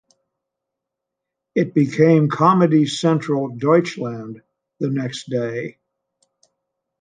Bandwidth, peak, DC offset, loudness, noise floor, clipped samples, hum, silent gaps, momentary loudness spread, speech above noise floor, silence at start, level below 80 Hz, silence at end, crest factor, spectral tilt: 9.6 kHz; -2 dBFS; under 0.1%; -19 LUFS; -82 dBFS; under 0.1%; none; none; 14 LU; 65 dB; 1.55 s; -66 dBFS; 1.3 s; 18 dB; -7 dB/octave